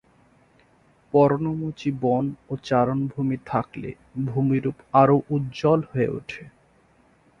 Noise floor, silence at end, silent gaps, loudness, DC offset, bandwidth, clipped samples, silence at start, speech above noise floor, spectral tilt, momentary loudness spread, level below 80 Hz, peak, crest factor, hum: -59 dBFS; 0.9 s; none; -23 LUFS; under 0.1%; 7.2 kHz; under 0.1%; 1.15 s; 36 dB; -8.5 dB/octave; 15 LU; -56 dBFS; -4 dBFS; 20 dB; none